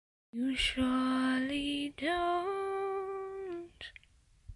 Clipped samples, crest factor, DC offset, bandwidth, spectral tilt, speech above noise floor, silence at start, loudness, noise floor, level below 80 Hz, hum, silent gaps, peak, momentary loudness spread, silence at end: under 0.1%; 14 dB; under 0.1%; 11.5 kHz; -4 dB/octave; 32 dB; 0.35 s; -34 LUFS; -65 dBFS; -54 dBFS; none; none; -20 dBFS; 14 LU; 0 s